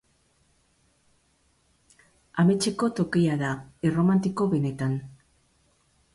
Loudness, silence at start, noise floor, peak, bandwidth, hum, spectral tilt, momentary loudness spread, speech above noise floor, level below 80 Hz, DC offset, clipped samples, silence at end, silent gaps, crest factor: -25 LUFS; 2.35 s; -67 dBFS; -12 dBFS; 11.5 kHz; none; -6.5 dB/octave; 8 LU; 43 dB; -60 dBFS; under 0.1%; under 0.1%; 1 s; none; 16 dB